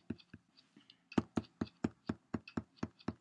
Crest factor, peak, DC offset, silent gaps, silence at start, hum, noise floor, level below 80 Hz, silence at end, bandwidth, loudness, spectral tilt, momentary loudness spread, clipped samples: 28 dB; -16 dBFS; under 0.1%; none; 0.1 s; none; -68 dBFS; -68 dBFS; 0.05 s; 10 kHz; -43 LUFS; -7 dB/octave; 17 LU; under 0.1%